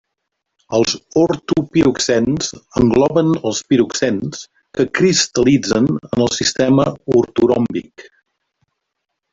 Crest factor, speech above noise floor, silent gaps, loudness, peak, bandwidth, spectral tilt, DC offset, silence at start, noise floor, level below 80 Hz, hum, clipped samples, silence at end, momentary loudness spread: 14 dB; 60 dB; none; -16 LUFS; -2 dBFS; 8 kHz; -4.5 dB/octave; under 0.1%; 0.7 s; -76 dBFS; -46 dBFS; none; under 0.1%; 1.3 s; 8 LU